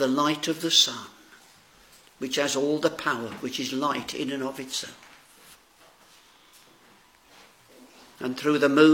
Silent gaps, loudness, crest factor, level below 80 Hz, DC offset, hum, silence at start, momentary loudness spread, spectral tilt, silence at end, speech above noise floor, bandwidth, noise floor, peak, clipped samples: none; -25 LUFS; 22 dB; -72 dBFS; under 0.1%; none; 0 s; 15 LU; -3 dB/octave; 0 s; 32 dB; 17 kHz; -57 dBFS; -4 dBFS; under 0.1%